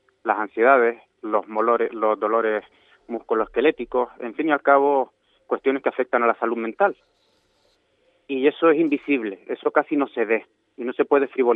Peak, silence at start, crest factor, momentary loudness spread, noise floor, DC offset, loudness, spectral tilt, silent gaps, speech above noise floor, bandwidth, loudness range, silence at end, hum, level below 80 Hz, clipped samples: -2 dBFS; 0.25 s; 20 dB; 11 LU; -65 dBFS; under 0.1%; -22 LUFS; -8 dB/octave; none; 44 dB; 4 kHz; 2 LU; 0 s; none; -64 dBFS; under 0.1%